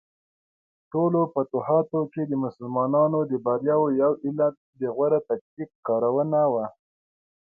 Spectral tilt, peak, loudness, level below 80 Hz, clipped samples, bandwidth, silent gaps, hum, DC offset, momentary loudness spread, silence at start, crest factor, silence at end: -13 dB/octave; -8 dBFS; -24 LUFS; -72 dBFS; under 0.1%; 2.8 kHz; 4.57-4.73 s, 5.41-5.57 s, 5.75-5.83 s; none; under 0.1%; 9 LU; 0.95 s; 16 dB; 0.9 s